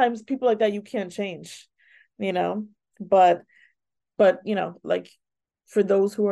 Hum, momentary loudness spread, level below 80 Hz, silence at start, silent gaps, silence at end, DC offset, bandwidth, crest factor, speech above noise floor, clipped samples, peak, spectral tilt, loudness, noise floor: none; 21 LU; -76 dBFS; 0 s; none; 0 s; under 0.1%; 12.5 kHz; 18 dB; 53 dB; under 0.1%; -8 dBFS; -6 dB/octave; -24 LUFS; -76 dBFS